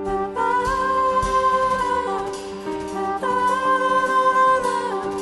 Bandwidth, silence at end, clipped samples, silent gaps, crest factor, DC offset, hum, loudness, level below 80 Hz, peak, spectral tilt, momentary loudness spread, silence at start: 11.5 kHz; 0 s; under 0.1%; none; 12 dB; under 0.1%; none; -20 LUFS; -42 dBFS; -8 dBFS; -4 dB/octave; 10 LU; 0 s